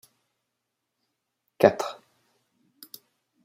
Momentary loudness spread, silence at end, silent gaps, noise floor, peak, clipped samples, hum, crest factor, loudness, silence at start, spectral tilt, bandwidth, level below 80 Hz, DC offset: 26 LU; 1.5 s; none; -82 dBFS; -2 dBFS; under 0.1%; none; 28 dB; -24 LUFS; 1.6 s; -5.5 dB/octave; 16 kHz; -74 dBFS; under 0.1%